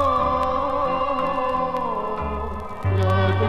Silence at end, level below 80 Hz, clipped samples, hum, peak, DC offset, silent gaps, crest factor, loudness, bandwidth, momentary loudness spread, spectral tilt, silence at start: 0 s; -38 dBFS; under 0.1%; none; -8 dBFS; under 0.1%; none; 14 dB; -23 LUFS; 7.4 kHz; 8 LU; -8 dB/octave; 0 s